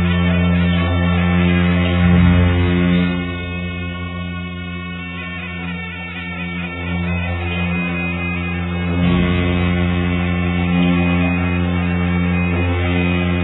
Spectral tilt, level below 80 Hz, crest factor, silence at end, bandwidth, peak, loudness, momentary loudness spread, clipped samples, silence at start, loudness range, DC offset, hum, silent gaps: -11 dB/octave; -32 dBFS; 16 dB; 0 s; 4.1 kHz; -2 dBFS; -18 LUFS; 11 LU; under 0.1%; 0 s; 9 LU; under 0.1%; none; none